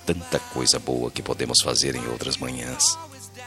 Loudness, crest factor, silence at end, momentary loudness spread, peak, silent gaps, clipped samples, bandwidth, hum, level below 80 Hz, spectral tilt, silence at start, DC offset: -23 LUFS; 24 dB; 0 s; 9 LU; -2 dBFS; none; under 0.1%; 16.5 kHz; none; -48 dBFS; -2 dB/octave; 0 s; under 0.1%